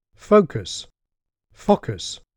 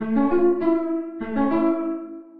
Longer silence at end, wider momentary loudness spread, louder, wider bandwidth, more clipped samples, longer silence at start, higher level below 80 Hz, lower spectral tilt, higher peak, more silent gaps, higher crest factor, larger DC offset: first, 0.2 s vs 0 s; first, 14 LU vs 9 LU; about the same, -21 LUFS vs -22 LUFS; first, 10.5 kHz vs 4.5 kHz; neither; first, 0.3 s vs 0 s; about the same, -50 dBFS vs -52 dBFS; second, -5.5 dB/octave vs -10 dB/octave; first, -4 dBFS vs -8 dBFS; neither; first, 20 dB vs 14 dB; neither